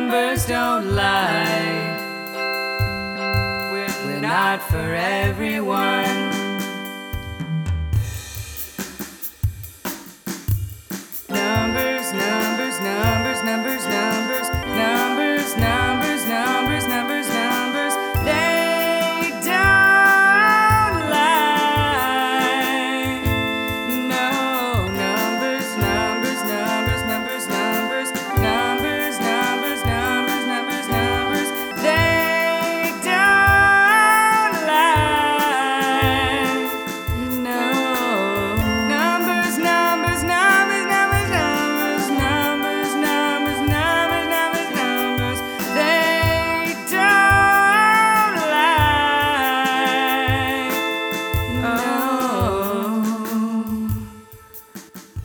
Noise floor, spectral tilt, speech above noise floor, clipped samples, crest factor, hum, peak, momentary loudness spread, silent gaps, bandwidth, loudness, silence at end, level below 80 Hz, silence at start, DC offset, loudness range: -42 dBFS; -4 dB/octave; 22 dB; under 0.1%; 18 dB; none; -2 dBFS; 11 LU; none; over 20 kHz; -18 LUFS; 0 s; -38 dBFS; 0 s; under 0.1%; 8 LU